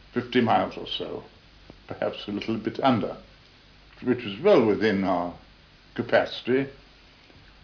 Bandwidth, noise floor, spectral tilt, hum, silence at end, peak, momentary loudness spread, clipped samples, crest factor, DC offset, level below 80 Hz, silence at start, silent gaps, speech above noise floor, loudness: 5.4 kHz; -53 dBFS; -7 dB/octave; none; 0.9 s; -8 dBFS; 15 LU; under 0.1%; 18 dB; under 0.1%; -58 dBFS; 0.15 s; none; 29 dB; -25 LUFS